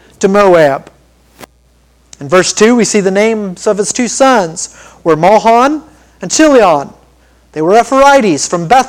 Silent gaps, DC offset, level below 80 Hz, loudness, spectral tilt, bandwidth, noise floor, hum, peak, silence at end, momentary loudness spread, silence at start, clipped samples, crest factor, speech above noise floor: none; under 0.1%; -42 dBFS; -9 LUFS; -4 dB/octave; 17 kHz; -49 dBFS; none; 0 dBFS; 0 s; 14 LU; 0.2 s; 1%; 10 dB; 40 dB